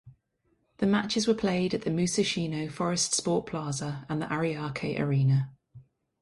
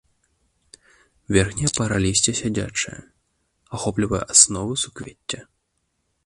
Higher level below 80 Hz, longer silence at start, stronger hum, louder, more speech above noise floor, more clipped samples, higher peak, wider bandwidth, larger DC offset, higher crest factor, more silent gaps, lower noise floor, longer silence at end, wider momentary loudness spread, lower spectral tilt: second, -60 dBFS vs -44 dBFS; second, 0.05 s vs 1.3 s; neither; second, -28 LUFS vs -20 LUFS; second, 45 dB vs 51 dB; neither; second, -12 dBFS vs 0 dBFS; about the same, 11.5 kHz vs 11.5 kHz; neither; second, 16 dB vs 24 dB; neither; about the same, -73 dBFS vs -73 dBFS; second, 0.4 s vs 0.85 s; second, 7 LU vs 18 LU; first, -5 dB/octave vs -3 dB/octave